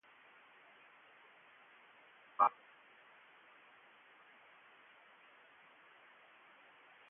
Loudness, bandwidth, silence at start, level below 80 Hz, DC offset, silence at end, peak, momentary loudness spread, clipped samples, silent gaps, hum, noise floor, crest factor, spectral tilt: -35 LUFS; 3.7 kHz; 2.4 s; under -90 dBFS; under 0.1%; 4.6 s; -16 dBFS; 22 LU; under 0.1%; none; none; -64 dBFS; 30 dB; 4.5 dB/octave